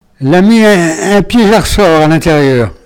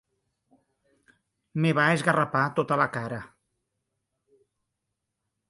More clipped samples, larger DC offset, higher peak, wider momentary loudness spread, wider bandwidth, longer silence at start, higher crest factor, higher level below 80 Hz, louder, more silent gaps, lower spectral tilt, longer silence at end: first, 2% vs under 0.1%; neither; first, 0 dBFS vs -8 dBFS; second, 4 LU vs 14 LU; first, 19 kHz vs 11.5 kHz; second, 0.2 s vs 1.55 s; second, 8 dB vs 22 dB; first, -26 dBFS vs -68 dBFS; first, -7 LUFS vs -25 LUFS; neither; about the same, -5.5 dB/octave vs -6 dB/octave; second, 0.1 s vs 2.25 s